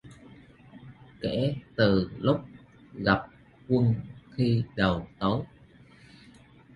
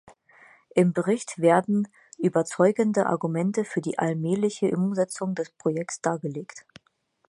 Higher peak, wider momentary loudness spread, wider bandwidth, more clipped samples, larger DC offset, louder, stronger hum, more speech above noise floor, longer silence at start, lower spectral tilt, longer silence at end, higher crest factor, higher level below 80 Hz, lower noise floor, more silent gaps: about the same, -8 dBFS vs -6 dBFS; first, 22 LU vs 8 LU; second, 10 kHz vs 11.5 kHz; neither; neither; second, -28 LUFS vs -25 LUFS; neither; second, 28 dB vs 45 dB; second, 0.05 s vs 0.75 s; first, -8.5 dB/octave vs -6.5 dB/octave; first, 1.3 s vs 0.7 s; about the same, 22 dB vs 20 dB; first, -52 dBFS vs -72 dBFS; second, -54 dBFS vs -69 dBFS; neither